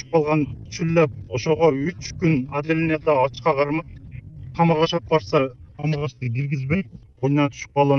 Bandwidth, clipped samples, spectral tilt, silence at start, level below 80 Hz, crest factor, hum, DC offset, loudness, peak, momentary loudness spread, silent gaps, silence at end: 6.8 kHz; under 0.1%; -7 dB/octave; 0.1 s; -48 dBFS; 18 dB; none; under 0.1%; -22 LUFS; -4 dBFS; 10 LU; none; 0 s